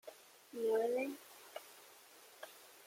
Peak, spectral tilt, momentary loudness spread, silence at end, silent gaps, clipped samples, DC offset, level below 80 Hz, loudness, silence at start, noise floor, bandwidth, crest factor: -26 dBFS; -3 dB/octave; 23 LU; 0.05 s; none; under 0.1%; under 0.1%; under -90 dBFS; -38 LUFS; 0.05 s; -61 dBFS; 16.5 kHz; 18 dB